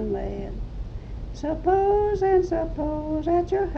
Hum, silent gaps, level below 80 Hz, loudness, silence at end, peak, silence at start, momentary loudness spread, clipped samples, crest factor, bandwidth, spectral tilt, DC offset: none; none; -34 dBFS; -24 LUFS; 0 s; -10 dBFS; 0 s; 16 LU; under 0.1%; 14 dB; 7 kHz; -8.5 dB/octave; under 0.1%